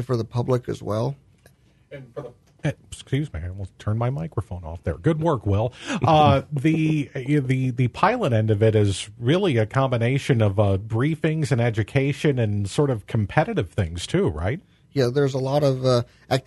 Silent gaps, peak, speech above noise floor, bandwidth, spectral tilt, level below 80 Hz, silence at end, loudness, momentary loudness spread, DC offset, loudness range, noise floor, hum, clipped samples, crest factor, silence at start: none; -4 dBFS; 34 dB; 12 kHz; -7 dB/octave; -46 dBFS; 0.05 s; -23 LUFS; 11 LU; under 0.1%; 8 LU; -56 dBFS; none; under 0.1%; 20 dB; 0 s